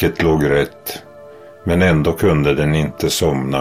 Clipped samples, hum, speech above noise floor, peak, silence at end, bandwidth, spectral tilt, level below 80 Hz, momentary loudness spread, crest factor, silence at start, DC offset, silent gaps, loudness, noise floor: under 0.1%; none; 23 dB; -4 dBFS; 0 s; 16 kHz; -6 dB/octave; -34 dBFS; 14 LU; 14 dB; 0 s; under 0.1%; none; -16 LUFS; -39 dBFS